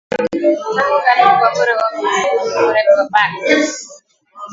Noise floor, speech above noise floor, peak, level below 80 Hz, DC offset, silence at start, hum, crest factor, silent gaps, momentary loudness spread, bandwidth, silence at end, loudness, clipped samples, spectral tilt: -35 dBFS; 21 dB; 0 dBFS; -60 dBFS; under 0.1%; 0.1 s; none; 14 dB; none; 6 LU; 7.8 kHz; 0 s; -14 LUFS; under 0.1%; -3 dB/octave